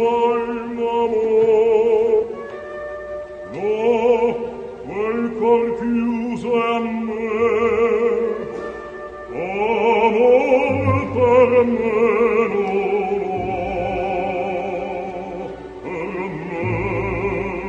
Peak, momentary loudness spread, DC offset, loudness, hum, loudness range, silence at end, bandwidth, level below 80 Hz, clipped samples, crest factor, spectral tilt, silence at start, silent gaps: -4 dBFS; 15 LU; under 0.1%; -19 LUFS; none; 8 LU; 0 s; 7.4 kHz; -44 dBFS; under 0.1%; 16 dB; -7.5 dB/octave; 0 s; none